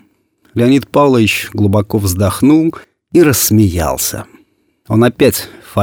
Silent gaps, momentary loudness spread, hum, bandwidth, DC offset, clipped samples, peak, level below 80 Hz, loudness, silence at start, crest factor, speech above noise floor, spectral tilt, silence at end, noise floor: none; 8 LU; none; 19.5 kHz; under 0.1%; under 0.1%; 0 dBFS; -36 dBFS; -12 LUFS; 0.55 s; 12 dB; 43 dB; -5.5 dB/octave; 0 s; -54 dBFS